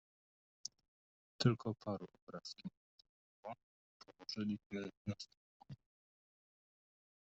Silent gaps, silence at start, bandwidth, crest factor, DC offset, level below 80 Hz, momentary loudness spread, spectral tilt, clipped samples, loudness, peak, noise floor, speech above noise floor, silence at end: 2.22-2.27 s, 2.77-2.98 s, 3.09-3.43 s, 3.63-4.00 s, 4.66-4.70 s, 4.97-5.05 s, 5.37-5.60 s; 1.4 s; 8 kHz; 26 dB; under 0.1%; -78 dBFS; 22 LU; -6 dB/octave; under 0.1%; -44 LUFS; -20 dBFS; under -90 dBFS; over 48 dB; 1.55 s